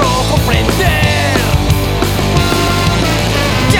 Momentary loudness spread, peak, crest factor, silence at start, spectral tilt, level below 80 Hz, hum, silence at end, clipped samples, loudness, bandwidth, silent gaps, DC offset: 2 LU; 0 dBFS; 12 dB; 0 s; -4.5 dB/octave; -20 dBFS; none; 0 s; under 0.1%; -12 LUFS; 19 kHz; none; under 0.1%